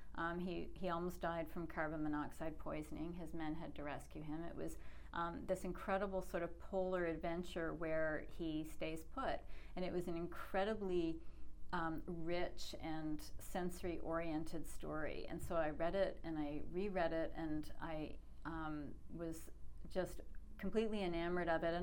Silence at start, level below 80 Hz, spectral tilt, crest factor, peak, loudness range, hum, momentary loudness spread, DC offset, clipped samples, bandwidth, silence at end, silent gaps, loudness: 0 s; -54 dBFS; -6 dB/octave; 16 dB; -26 dBFS; 4 LU; none; 9 LU; under 0.1%; under 0.1%; 17.5 kHz; 0 s; none; -44 LUFS